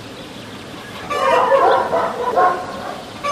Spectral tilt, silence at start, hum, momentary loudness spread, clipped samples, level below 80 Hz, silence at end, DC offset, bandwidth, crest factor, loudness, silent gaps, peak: -4 dB/octave; 0 s; none; 19 LU; under 0.1%; -52 dBFS; 0 s; under 0.1%; 15.5 kHz; 16 dB; -17 LUFS; none; -4 dBFS